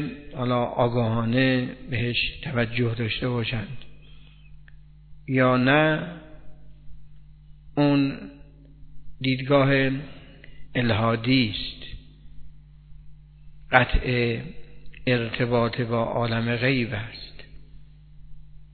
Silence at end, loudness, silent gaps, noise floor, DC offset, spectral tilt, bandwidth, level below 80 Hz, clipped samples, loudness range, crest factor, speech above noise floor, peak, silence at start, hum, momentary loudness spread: 0.1 s; -24 LUFS; none; -47 dBFS; under 0.1%; -10 dB/octave; 4.6 kHz; -42 dBFS; under 0.1%; 4 LU; 26 dB; 24 dB; 0 dBFS; 0 s; none; 17 LU